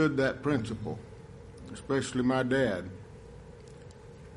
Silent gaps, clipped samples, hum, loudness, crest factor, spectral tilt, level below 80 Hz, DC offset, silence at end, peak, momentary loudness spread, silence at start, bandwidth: none; under 0.1%; none; -30 LUFS; 18 dB; -6 dB/octave; -56 dBFS; under 0.1%; 0 s; -14 dBFS; 22 LU; 0 s; 11.5 kHz